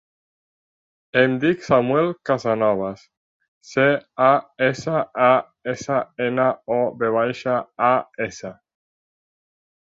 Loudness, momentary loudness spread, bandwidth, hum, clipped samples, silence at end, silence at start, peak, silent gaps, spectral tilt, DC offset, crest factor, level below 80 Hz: -21 LUFS; 11 LU; 7.8 kHz; none; under 0.1%; 1.4 s; 1.15 s; -2 dBFS; 3.17-3.40 s, 3.48-3.61 s; -6 dB/octave; under 0.1%; 20 dB; -62 dBFS